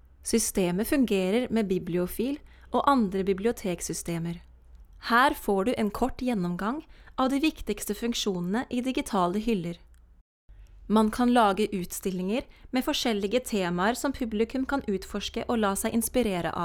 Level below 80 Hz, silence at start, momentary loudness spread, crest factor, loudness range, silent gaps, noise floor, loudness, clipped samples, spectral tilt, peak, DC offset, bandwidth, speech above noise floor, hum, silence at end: -48 dBFS; 0.25 s; 9 LU; 20 dB; 2 LU; 10.21-10.48 s; -51 dBFS; -27 LUFS; under 0.1%; -4.5 dB/octave; -8 dBFS; under 0.1%; 19 kHz; 24 dB; none; 0 s